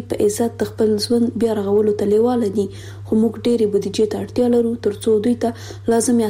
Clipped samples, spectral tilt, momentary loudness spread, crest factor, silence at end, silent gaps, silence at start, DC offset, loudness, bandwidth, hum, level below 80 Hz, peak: under 0.1%; -5.5 dB/octave; 5 LU; 10 dB; 0 s; none; 0 s; under 0.1%; -18 LUFS; 16 kHz; none; -50 dBFS; -8 dBFS